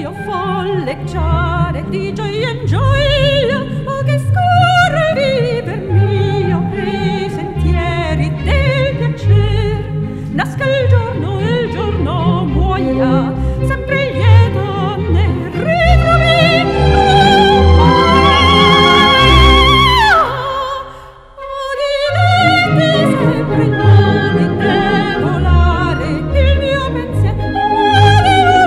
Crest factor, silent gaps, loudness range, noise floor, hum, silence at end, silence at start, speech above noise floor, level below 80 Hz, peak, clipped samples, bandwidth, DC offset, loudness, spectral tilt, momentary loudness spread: 12 dB; none; 7 LU; -35 dBFS; none; 0 s; 0 s; 19 dB; -22 dBFS; 0 dBFS; under 0.1%; 12 kHz; under 0.1%; -12 LUFS; -6.5 dB/octave; 11 LU